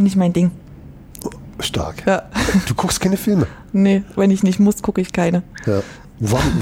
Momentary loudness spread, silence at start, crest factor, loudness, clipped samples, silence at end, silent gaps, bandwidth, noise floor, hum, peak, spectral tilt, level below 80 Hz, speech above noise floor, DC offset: 15 LU; 0 s; 14 dB; -18 LUFS; under 0.1%; 0 s; none; 16.5 kHz; -38 dBFS; none; -4 dBFS; -6 dB/octave; -36 dBFS; 21 dB; under 0.1%